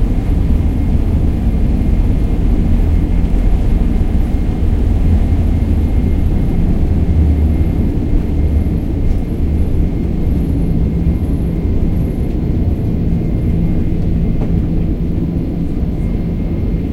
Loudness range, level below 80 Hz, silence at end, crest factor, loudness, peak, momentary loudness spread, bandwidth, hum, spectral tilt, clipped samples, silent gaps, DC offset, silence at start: 2 LU; -16 dBFS; 0 s; 12 dB; -16 LUFS; -2 dBFS; 4 LU; 12 kHz; none; -9.5 dB/octave; under 0.1%; none; under 0.1%; 0 s